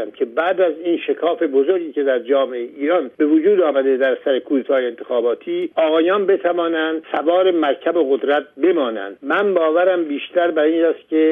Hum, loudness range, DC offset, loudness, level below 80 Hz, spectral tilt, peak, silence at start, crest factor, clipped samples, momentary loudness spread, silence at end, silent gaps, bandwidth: none; 1 LU; under 0.1%; -18 LUFS; -74 dBFS; -7 dB/octave; -4 dBFS; 0 s; 12 dB; under 0.1%; 6 LU; 0 s; none; 3.8 kHz